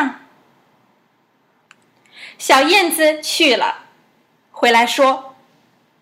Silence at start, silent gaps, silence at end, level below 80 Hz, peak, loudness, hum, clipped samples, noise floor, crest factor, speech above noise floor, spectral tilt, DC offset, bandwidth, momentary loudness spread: 0 s; none; 0.7 s; -70 dBFS; 0 dBFS; -14 LUFS; none; under 0.1%; -60 dBFS; 18 dB; 46 dB; -1 dB/octave; under 0.1%; 16 kHz; 14 LU